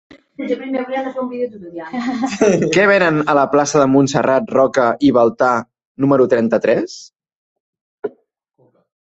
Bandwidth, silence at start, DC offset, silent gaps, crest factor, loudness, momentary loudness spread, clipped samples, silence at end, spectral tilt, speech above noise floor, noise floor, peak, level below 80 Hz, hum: 8.2 kHz; 0.4 s; under 0.1%; 5.85-5.95 s, 7.36-7.73 s, 7.81-7.98 s; 16 dB; -15 LUFS; 15 LU; under 0.1%; 0.95 s; -5.5 dB/octave; 45 dB; -60 dBFS; 0 dBFS; -56 dBFS; none